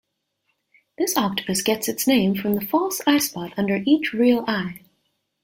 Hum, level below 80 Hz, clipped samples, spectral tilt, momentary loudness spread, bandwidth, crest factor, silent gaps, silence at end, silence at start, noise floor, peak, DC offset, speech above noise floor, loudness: none; -62 dBFS; under 0.1%; -4 dB/octave; 7 LU; 17 kHz; 18 dB; none; 0.65 s; 1 s; -73 dBFS; -4 dBFS; under 0.1%; 52 dB; -21 LUFS